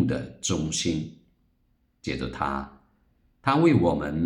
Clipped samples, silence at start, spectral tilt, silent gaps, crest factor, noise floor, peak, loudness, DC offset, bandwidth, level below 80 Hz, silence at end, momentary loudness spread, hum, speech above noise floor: under 0.1%; 0 s; -5 dB/octave; none; 20 dB; -68 dBFS; -8 dBFS; -26 LUFS; under 0.1%; 12 kHz; -48 dBFS; 0 s; 15 LU; none; 43 dB